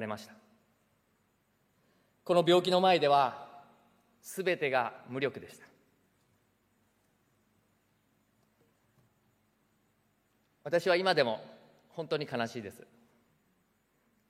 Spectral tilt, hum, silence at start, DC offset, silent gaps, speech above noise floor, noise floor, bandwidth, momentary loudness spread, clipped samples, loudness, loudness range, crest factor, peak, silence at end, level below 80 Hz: -5 dB/octave; none; 0 s; under 0.1%; none; 44 dB; -74 dBFS; 16 kHz; 22 LU; under 0.1%; -30 LUFS; 9 LU; 22 dB; -12 dBFS; 1.6 s; -84 dBFS